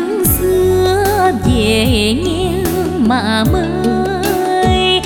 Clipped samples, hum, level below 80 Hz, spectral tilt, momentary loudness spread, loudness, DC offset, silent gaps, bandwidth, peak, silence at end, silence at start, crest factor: under 0.1%; none; -26 dBFS; -5 dB/octave; 4 LU; -13 LUFS; under 0.1%; none; 19 kHz; 0 dBFS; 0 s; 0 s; 12 dB